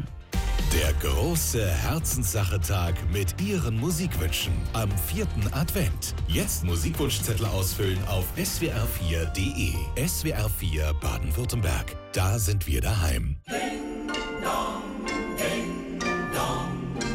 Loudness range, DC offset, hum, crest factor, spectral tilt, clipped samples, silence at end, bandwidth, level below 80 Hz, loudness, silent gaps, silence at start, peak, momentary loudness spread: 3 LU; under 0.1%; none; 14 dB; -4.5 dB/octave; under 0.1%; 0 s; 17 kHz; -32 dBFS; -27 LUFS; none; 0 s; -14 dBFS; 5 LU